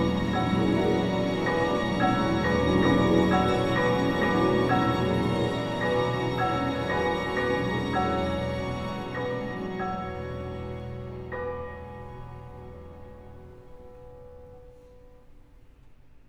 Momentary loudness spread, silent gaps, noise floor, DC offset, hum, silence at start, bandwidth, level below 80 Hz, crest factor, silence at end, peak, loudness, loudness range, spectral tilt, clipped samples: 19 LU; none; -52 dBFS; under 0.1%; none; 0 s; 14 kHz; -44 dBFS; 18 dB; 0.1 s; -10 dBFS; -26 LUFS; 16 LU; -7 dB/octave; under 0.1%